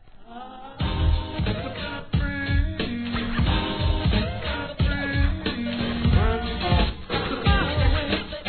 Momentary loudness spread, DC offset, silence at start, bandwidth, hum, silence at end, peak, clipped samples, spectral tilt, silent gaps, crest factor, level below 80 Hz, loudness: 8 LU; 0.2%; 0.1 s; 4.6 kHz; none; 0 s; -8 dBFS; under 0.1%; -9.5 dB/octave; none; 16 dB; -28 dBFS; -25 LUFS